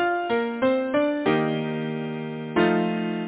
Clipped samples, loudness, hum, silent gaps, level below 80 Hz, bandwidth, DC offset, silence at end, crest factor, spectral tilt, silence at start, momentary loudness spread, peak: under 0.1%; -24 LUFS; none; none; -62 dBFS; 4 kHz; under 0.1%; 0 s; 14 dB; -10.5 dB/octave; 0 s; 8 LU; -10 dBFS